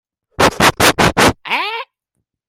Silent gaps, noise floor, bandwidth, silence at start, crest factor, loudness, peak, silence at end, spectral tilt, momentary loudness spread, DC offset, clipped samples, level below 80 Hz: none; -74 dBFS; 16.5 kHz; 0.4 s; 16 dB; -13 LUFS; 0 dBFS; 0.65 s; -3 dB/octave; 9 LU; under 0.1%; under 0.1%; -36 dBFS